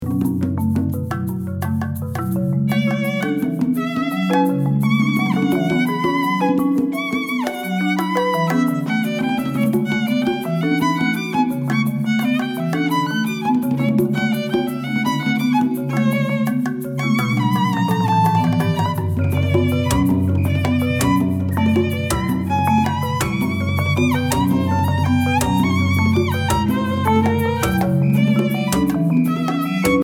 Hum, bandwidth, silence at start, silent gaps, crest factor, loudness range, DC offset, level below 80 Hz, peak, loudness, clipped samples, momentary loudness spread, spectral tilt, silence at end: none; 19 kHz; 0 s; none; 16 dB; 2 LU; under 0.1%; -42 dBFS; -2 dBFS; -19 LUFS; under 0.1%; 4 LU; -6.5 dB/octave; 0 s